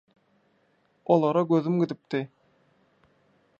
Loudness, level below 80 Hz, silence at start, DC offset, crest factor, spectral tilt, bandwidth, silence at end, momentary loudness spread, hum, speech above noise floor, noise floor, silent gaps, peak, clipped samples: -25 LUFS; -78 dBFS; 1.1 s; under 0.1%; 20 dB; -9 dB/octave; 7.2 kHz; 1.35 s; 14 LU; none; 43 dB; -67 dBFS; none; -8 dBFS; under 0.1%